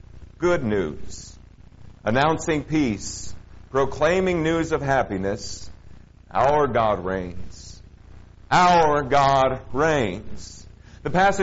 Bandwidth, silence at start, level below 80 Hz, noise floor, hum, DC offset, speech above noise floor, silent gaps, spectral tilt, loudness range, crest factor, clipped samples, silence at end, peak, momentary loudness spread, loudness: 8 kHz; 0.1 s; -42 dBFS; -45 dBFS; none; under 0.1%; 24 dB; none; -4.5 dB/octave; 5 LU; 18 dB; under 0.1%; 0 s; -4 dBFS; 21 LU; -22 LUFS